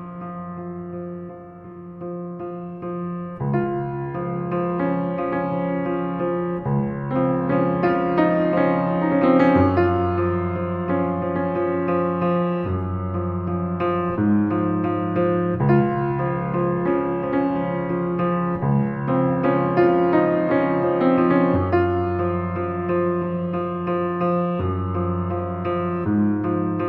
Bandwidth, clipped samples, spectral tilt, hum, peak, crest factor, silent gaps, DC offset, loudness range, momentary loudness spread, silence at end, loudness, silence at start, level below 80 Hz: 5 kHz; under 0.1%; -11 dB/octave; none; -4 dBFS; 16 dB; none; under 0.1%; 6 LU; 12 LU; 0 s; -22 LUFS; 0 s; -50 dBFS